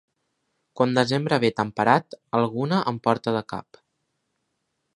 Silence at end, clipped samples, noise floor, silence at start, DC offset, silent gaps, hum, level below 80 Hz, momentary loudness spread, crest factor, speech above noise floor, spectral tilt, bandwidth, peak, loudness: 1.35 s; under 0.1%; -76 dBFS; 0.75 s; under 0.1%; none; none; -64 dBFS; 7 LU; 24 dB; 54 dB; -6.5 dB/octave; 11.5 kHz; -2 dBFS; -23 LUFS